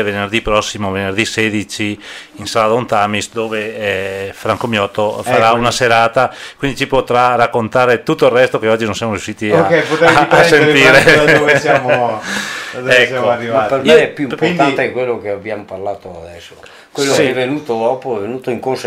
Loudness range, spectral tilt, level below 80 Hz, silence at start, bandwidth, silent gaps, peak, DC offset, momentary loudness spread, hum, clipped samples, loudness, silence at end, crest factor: 8 LU; -4.5 dB/octave; -42 dBFS; 0 s; 16 kHz; none; 0 dBFS; under 0.1%; 13 LU; none; under 0.1%; -13 LUFS; 0 s; 14 dB